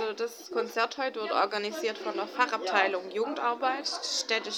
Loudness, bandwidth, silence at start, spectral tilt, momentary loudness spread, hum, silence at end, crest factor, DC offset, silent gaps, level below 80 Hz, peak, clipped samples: -30 LUFS; 18.5 kHz; 0 s; -1.5 dB/octave; 7 LU; none; 0 s; 22 dB; under 0.1%; none; -90 dBFS; -8 dBFS; under 0.1%